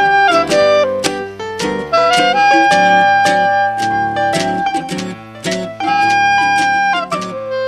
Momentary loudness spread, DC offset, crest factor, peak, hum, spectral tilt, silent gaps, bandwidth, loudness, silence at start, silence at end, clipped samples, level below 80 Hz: 11 LU; under 0.1%; 14 dB; 0 dBFS; none; -3.5 dB/octave; none; 14 kHz; -13 LUFS; 0 s; 0 s; under 0.1%; -48 dBFS